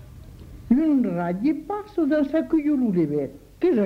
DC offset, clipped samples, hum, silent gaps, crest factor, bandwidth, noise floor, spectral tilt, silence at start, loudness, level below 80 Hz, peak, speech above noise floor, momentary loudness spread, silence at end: under 0.1%; under 0.1%; none; none; 16 dB; 6 kHz; -42 dBFS; -9 dB/octave; 0 s; -23 LUFS; -48 dBFS; -8 dBFS; 20 dB; 8 LU; 0 s